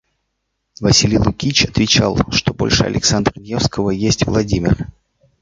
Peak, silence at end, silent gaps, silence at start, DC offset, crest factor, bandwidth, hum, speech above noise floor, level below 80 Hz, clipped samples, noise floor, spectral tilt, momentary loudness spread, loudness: 0 dBFS; 0.55 s; none; 0.8 s; under 0.1%; 16 dB; 9.4 kHz; none; 57 dB; -32 dBFS; under 0.1%; -72 dBFS; -4 dB/octave; 7 LU; -15 LUFS